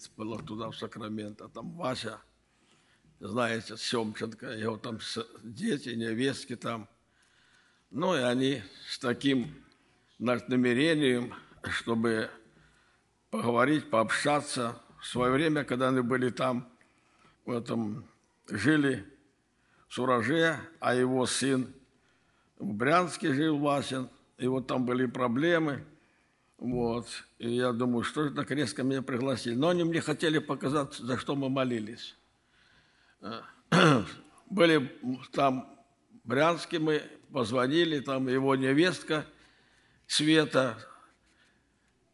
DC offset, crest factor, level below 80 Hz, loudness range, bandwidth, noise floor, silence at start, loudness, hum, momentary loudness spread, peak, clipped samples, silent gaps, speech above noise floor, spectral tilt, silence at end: under 0.1%; 22 dB; -66 dBFS; 7 LU; 12 kHz; -70 dBFS; 0 s; -30 LUFS; none; 15 LU; -8 dBFS; under 0.1%; none; 41 dB; -5 dB/octave; 1.2 s